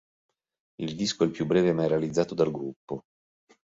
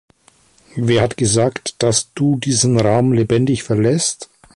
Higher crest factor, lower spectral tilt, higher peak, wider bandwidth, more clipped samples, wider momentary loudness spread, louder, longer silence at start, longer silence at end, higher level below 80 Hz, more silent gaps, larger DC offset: about the same, 20 dB vs 16 dB; about the same, -6 dB/octave vs -5 dB/octave; second, -10 dBFS vs -2 dBFS; second, 8 kHz vs 11.5 kHz; neither; first, 14 LU vs 6 LU; second, -27 LUFS vs -16 LUFS; about the same, 0.8 s vs 0.75 s; first, 0.8 s vs 0.3 s; second, -62 dBFS vs -46 dBFS; first, 2.76-2.88 s vs none; neither